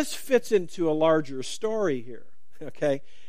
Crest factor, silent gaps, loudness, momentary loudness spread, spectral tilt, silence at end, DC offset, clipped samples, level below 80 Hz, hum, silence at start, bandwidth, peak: 18 dB; none; -26 LUFS; 15 LU; -5 dB/octave; 0.3 s; 2%; under 0.1%; -68 dBFS; none; 0 s; 15.5 kHz; -8 dBFS